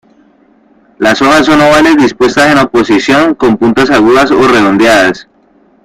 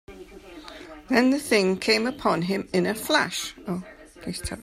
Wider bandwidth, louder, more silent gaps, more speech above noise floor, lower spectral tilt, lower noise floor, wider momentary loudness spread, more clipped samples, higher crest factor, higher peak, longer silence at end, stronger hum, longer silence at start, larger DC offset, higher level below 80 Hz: about the same, 15.5 kHz vs 15.5 kHz; first, -6 LUFS vs -24 LUFS; neither; first, 40 dB vs 20 dB; about the same, -4.5 dB/octave vs -4 dB/octave; about the same, -46 dBFS vs -44 dBFS; second, 4 LU vs 22 LU; first, 0.2% vs under 0.1%; second, 8 dB vs 20 dB; first, 0 dBFS vs -6 dBFS; first, 0.6 s vs 0 s; neither; first, 1 s vs 0.1 s; neither; first, -38 dBFS vs -52 dBFS